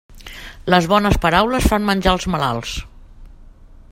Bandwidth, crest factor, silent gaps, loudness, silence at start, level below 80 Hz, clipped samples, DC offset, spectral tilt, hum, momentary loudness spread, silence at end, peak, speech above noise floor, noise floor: 16.5 kHz; 18 dB; none; -17 LUFS; 0.1 s; -30 dBFS; under 0.1%; under 0.1%; -5 dB/octave; none; 17 LU; 0.15 s; 0 dBFS; 25 dB; -42 dBFS